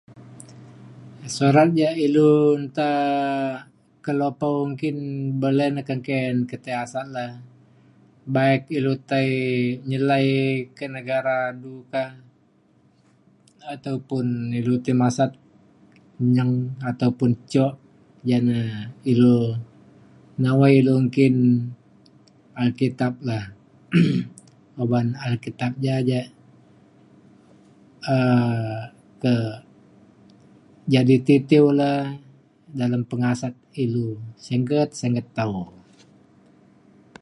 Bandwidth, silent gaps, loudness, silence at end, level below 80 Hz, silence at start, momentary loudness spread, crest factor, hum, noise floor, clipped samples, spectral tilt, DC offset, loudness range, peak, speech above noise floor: 11 kHz; none; -22 LUFS; 1.55 s; -62 dBFS; 0.15 s; 16 LU; 20 dB; none; -59 dBFS; under 0.1%; -7.5 dB/octave; under 0.1%; 7 LU; -2 dBFS; 38 dB